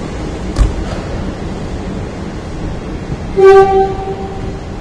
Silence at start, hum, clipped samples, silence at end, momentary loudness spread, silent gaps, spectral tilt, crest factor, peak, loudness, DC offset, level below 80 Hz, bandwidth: 0 s; none; 0.6%; 0 s; 17 LU; none; -7 dB/octave; 14 dB; 0 dBFS; -15 LUFS; under 0.1%; -22 dBFS; 10.5 kHz